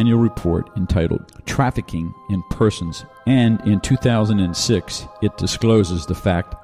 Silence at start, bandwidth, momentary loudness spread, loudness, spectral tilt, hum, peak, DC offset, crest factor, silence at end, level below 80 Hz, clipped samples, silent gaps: 0 s; 14 kHz; 10 LU; -19 LUFS; -6 dB/octave; none; -4 dBFS; under 0.1%; 16 dB; 0.05 s; -36 dBFS; under 0.1%; none